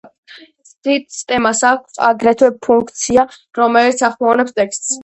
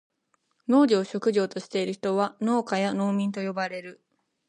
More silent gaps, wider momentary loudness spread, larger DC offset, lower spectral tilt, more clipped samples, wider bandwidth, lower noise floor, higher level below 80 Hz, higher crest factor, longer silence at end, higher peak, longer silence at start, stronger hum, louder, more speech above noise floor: first, 0.78-0.82 s vs none; second, 6 LU vs 11 LU; neither; second, -2.5 dB/octave vs -6 dB/octave; neither; second, 8.6 kHz vs 10.5 kHz; second, -43 dBFS vs -73 dBFS; first, -52 dBFS vs -78 dBFS; about the same, 14 dB vs 16 dB; second, 0 s vs 0.55 s; first, 0 dBFS vs -10 dBFS; second, 0.3 s vs 0.7 s; neither; first, -14 LUFS vs -26 LUFS; second, 29 dB vs 48 dB